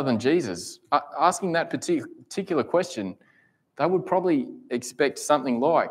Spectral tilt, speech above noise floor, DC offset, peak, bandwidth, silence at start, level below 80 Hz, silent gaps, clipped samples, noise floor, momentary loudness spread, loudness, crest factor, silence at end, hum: -5 dB/octave; 39 dB; under 0.1%; -4 dBFS; 16 kHz; 0 s; -72 dBFS; none; under 0.1%; -63 dBFS; 10 LU; -25 LUFS; 20 dB; 0 s; none